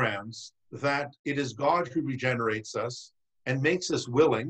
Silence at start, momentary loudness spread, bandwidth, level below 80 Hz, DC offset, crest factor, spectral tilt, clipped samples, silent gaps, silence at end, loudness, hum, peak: 0 s; 13 LU; 9 kHz; -66 dBFS; under 0.1%; 18 dB; -5 dB/octave; under 0.1%; 1.19-1.24 s; 0 s; -29 LUFS; none; -10 dBFS